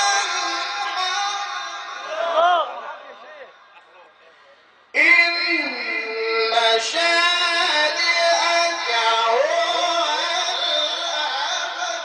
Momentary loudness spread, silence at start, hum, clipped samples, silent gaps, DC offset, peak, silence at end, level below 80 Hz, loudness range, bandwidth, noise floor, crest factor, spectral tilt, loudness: 10 LU; 0 s; none; under 0.1%; none; under 0.1%; -4 dBFS; 0 s; -78 dBFS; 7 LU; 10 kHz; -52 dBFS; 18 dB; 2 dB/octave; -19 LUFS